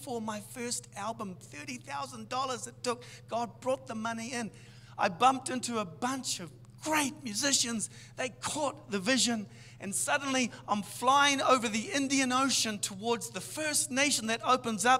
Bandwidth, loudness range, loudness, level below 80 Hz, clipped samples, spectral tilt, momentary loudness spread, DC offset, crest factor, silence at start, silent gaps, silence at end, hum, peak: 16 kHz; 9 LU; -31 LUFS; -68 dBFS; under 0.1%; -2 dB/octave; 12 LU; under 0.1%; 22 dB; 0 s; none; 0 s; none; -10 dBFS